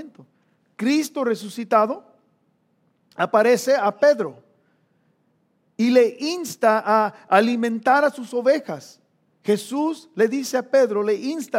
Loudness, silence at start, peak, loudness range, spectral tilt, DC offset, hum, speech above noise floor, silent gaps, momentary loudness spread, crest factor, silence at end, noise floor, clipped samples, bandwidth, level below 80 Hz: -21 LUFS; 0 s; -2 dBFS; 3 LU; -4.5 dB/octave; under 0.1%; none; 46 dB; none; 9 LU; 20 dB; 0 s; -66 dBFS; under 0.1%; 16.5 kHz; -86 dBFS